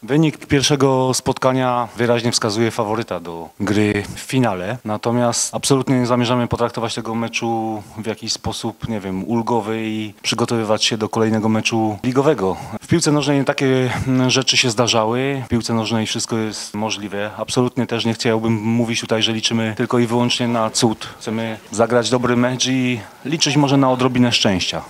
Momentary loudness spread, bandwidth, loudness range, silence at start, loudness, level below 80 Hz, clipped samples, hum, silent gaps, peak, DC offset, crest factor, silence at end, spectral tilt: 9 LU; 16 kHz; 4 LU; 0 s; -18 LUFS; -50 dBFS; under 0.1%; none; none; 0 dBFS; under 0.1%; 18 dB; 0 s; -4.5 dB/octave